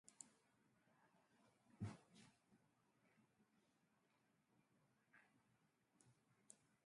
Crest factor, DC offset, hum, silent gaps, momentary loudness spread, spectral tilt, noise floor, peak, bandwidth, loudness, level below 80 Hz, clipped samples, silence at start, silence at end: 30 dB; under 0.1%; none; none; 14 LU; -5 dB/octave; -84 dBFS; -36 dBFS; 11 kHz; -60 LUFS; -84 dBFS; under 0.1%; 0.05 s; 0.1 s